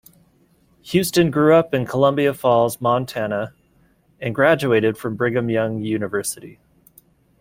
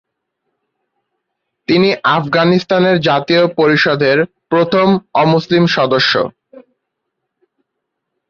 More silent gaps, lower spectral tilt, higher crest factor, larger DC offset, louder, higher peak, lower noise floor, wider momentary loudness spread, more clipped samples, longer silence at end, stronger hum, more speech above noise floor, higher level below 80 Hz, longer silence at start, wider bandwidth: neither; about the same, -5.5 dB/octave vs -6.5 dB/octave; about the same, 18 dB vs 14 dB; neither; second, -19 LUFS vs -13 LUFS; about the same, -2 dBFS vs -2 dBFS; second, -58 dBFS vs -75 dBFS; first, 11 LU vs 4 LU; neither; second, 0.9 s vs 1.7 s; neither; second, 40 dB vs 63 dB; about the same, -54 dBFS vs -54 dBFS; second, 0.85 s vs 1.7 s; first, 16.5 kHz vs 7 kHz